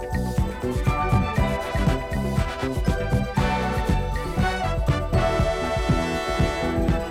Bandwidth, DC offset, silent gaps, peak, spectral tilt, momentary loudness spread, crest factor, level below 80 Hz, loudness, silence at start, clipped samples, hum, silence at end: 16 kHz; under 0.1%; none; -8 dBFS; -6.5 dB/octave; 4 LU; 16 dB; -28 dBFS; -24 LUFS; 0 s; under 0.1%; none; 0 s